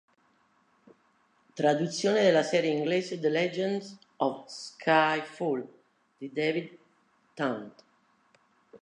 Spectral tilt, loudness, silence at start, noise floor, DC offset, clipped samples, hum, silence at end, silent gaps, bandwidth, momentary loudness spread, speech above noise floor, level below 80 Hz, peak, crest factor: -5 dB/octave; -28 LUFS; 1.55 s; -68 dBFS; under 0.1%; under 0.1%; none; 0.05 s; none; 11 kHz; 19 LU; 40 dB; -84 dBFS; -10 dBFS; 20 dB